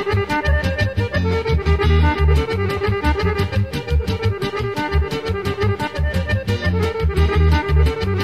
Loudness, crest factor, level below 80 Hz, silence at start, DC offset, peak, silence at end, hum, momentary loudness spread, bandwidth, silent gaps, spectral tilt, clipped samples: -19 LUFS; 14 dB; -22 dBFS; 0 s; 0.4%; -4 dBFS; 0 s; none; 6 LU; 13 kHz; none; -7 dB/octave; under 0.1%